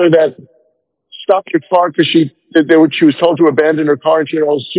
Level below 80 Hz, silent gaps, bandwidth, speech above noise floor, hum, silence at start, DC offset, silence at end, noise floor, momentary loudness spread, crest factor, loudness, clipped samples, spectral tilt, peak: -62 dBFS; none; 4 kHz; 51 dB; none; 0 s; under 0.1%; 0 s; -62 dBFS; 5 LU; 12 dB; -12 LUFS; 0.3%; -10 dB/octave; 0 dBFS